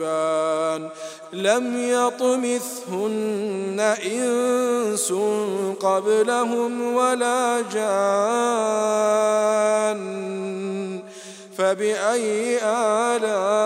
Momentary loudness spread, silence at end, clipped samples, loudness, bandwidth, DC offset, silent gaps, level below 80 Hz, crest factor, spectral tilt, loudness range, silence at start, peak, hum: 9 LU; 0 s; under 0.1%; -22 LUFS; 16 kHz; under 0.1%; none; -84 dBFS; 18 dB; -3.5 dB/octave; 3 LU; 0 s; -4 dBFS; none